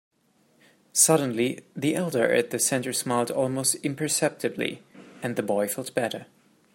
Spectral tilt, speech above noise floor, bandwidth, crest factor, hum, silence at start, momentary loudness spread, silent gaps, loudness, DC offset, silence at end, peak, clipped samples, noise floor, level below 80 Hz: -3.5 dB/octave; 39 dB; 16.5 kHz; 22 dB; none; 0.95 s; 11 LU; none; -25 LUFS; under 0.1%; 0.5 s; -4 dBFS; under 0.1%; -65 dBFS; -72 dBFS